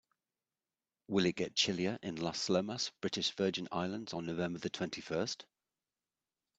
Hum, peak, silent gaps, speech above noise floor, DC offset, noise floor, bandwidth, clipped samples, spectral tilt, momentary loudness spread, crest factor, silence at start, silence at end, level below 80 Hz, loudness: none; -18 dBFS; none; over 54 dB; under 0.1%; under -90 dBFS; 8.6 kHz; under 0.1%; -4 dB/octave; 7 LU; 20 dB; 1.1 s; 1.15 s; -72 dBFS; -36 LUFS